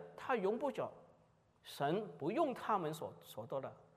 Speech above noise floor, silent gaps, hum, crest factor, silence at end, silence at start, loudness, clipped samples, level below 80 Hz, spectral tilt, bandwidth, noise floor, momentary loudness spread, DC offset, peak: 32 dB; none; none; 18 dB; 0.15 s; 0 s; -40 LUFS; under 0.1%; -84 dBFS; -6 dB/octave; 15.5 kHz; -71 dBFS; 12 LU; under 0.1%; -22 dBFS